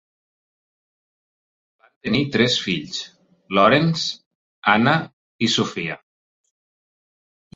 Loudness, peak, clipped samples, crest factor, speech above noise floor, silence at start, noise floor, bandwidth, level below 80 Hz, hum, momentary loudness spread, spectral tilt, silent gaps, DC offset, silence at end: -20 LUFS; -2 dBFS; under 0.1%; 22 dB; over 71 dB; 2.05 s; under -90 dBFS; 8 kHz; -58 dBFS; none; 17 LU; -4.5 dB/octave; 4.26-4.62 s, 5.13-5.39 s; under 0.1%; 1.6 s